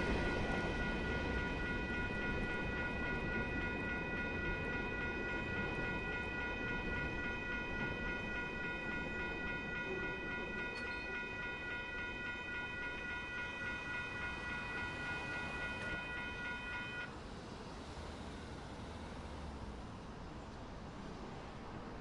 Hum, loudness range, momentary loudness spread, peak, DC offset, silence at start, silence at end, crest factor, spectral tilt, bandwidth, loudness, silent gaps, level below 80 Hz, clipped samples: none; 10 LU; 10 LU; -26 dBFS; under 0.1%; 0 s; 0 s; 16 dB; -5.5 dB/octave; 11.5 kHz; -41 LUFS; none; -50 dBFS; under 0.1%